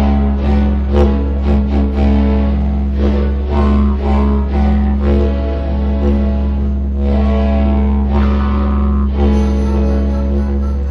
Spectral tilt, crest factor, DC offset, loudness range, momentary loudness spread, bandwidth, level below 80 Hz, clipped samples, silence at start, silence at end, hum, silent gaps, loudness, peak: -9.5 dB/octave; 12 dB; under 0.1%; 1 LU; 3 LU; 5.2 kHz; -14 dBFS; under 0.1%; 0 s; 0 s; none; none; -15 LUFS; 0 dBFS